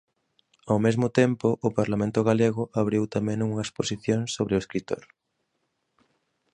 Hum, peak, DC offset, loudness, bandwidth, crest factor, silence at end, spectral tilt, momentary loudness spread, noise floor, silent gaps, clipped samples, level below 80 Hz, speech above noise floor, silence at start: none; -6 dBFS; under 0.1%; -26 LUFS; 10 kHz; 20 dB; 1.55 s; -6.5 dB/octave; 7 LU; -76 dBFS; none; under 0.1%; -56 dBFS; 52 dB; 0.65 s